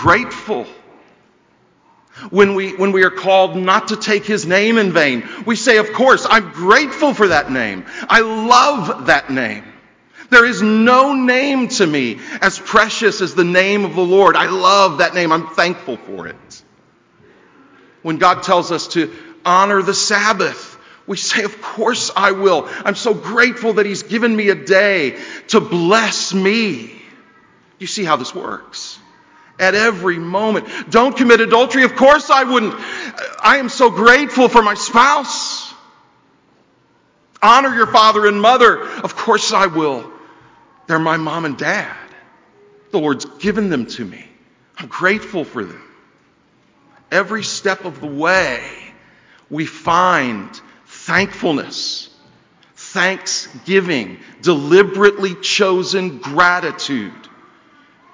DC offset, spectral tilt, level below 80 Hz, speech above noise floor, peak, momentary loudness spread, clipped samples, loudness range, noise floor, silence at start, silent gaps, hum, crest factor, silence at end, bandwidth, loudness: under 0.1%; -3.5 dB/octave; -52 dBFS; 41 dB; 0 dBFS; 15 LU; 0.2%; 8 LU; -56 dBFS; 0 s; none; none; 16 dB; 1 s; 8 kHz; -14 LUFS